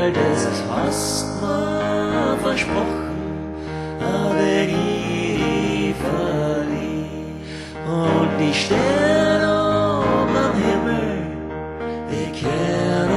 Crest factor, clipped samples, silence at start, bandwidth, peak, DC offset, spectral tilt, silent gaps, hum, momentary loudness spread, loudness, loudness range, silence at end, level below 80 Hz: 16 dB; under 0.1%; 0 s; 13 kHz; -4 dBFS; under 0.1%; -5.5 dB/octave; none; none; 11 LU; -20 LUFS; 4 LU; 0 s; -40 dBFS